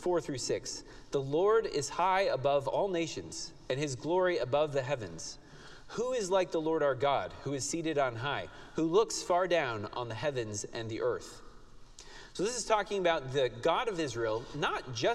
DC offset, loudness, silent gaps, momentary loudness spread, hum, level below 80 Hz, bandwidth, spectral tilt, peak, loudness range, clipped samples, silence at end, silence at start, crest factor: under 0.1%; -32 LUFS; none; 12 LU; none; -58 dBFS; 13 kHz; -4 dB/octave; -14 dBFS; 3 LU; under 0.1%; 0 s; 0 s; 18 dB